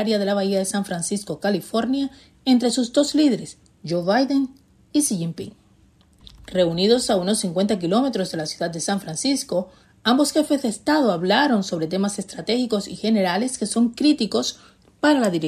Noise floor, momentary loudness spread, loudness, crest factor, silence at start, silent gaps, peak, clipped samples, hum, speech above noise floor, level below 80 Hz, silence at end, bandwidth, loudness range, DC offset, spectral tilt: -56 dBFS; 9 LU; -21 LUFS; 18 dB; 0 s; none; -4 dBFS; under 0.1%; none; 35 dB; -58 dBFS; 0 s; 13.5 kHz; 2 LU; under 0.1%; -4.5 dB/octave